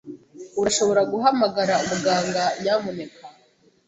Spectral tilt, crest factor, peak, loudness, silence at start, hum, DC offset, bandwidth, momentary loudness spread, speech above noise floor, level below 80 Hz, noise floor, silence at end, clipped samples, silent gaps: -3.5 dB/octave; 18 dB; -6 dBFS; -22 LUFS; 0.05 s; none; under 0.1%; 8.4 kHz; 16 LU; 38 dB; -60 dBFS; -59 dBFS; 0.55 s; under 0.1%; none